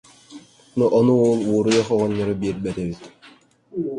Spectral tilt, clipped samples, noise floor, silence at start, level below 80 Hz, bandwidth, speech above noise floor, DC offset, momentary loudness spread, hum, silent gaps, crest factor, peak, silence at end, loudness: -6.5 dB/octave; under 0.1%; -51 dBFS; 0.3 s; -52 dBFS; 11 kHz; 32 dB; under 0.1%; 14 LU; none; none; 16 dB; -6 dBFS; 0 s; -20 LUFS